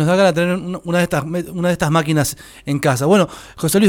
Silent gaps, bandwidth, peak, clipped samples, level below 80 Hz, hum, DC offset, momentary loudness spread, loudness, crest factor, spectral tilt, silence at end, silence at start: none; 18.5 kHz; -2 dBFS; under 0.1%; -46 dBFS; none; under 0.1%; 9 LU; -17 LUFS; 14 dB; -5.5 dB/octave; 0 s; 0 s